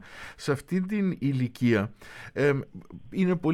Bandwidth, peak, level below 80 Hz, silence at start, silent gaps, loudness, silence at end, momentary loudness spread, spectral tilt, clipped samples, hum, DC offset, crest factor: 13.5 kHz; -12 dBFS; -58 dBFS; 0 s; none; -28 LUFS; 0 s; 17 LU; -7.5 dB/octave; under 0.1%; none; under 0.1%; 16 dB